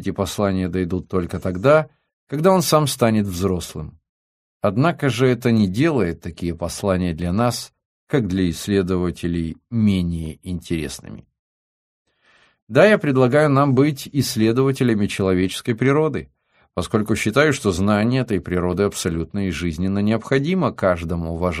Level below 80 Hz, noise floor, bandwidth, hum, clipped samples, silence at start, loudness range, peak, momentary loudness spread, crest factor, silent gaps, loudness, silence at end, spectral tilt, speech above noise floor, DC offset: -44 dBFS; -58 dBFS; 15.5 kHz; none; under 0.1%; 0 s; 5 LU; 0 dBFS; 10 LU; 18 dB; 2.13-2.27 s, 4.09-4.60 s, 7.85-8.07 s, 11.39-12.05 s, 12.62-12.67 s; -20 LUFS; 0 s; -6 dB/octave; 39 dB; under 0.1%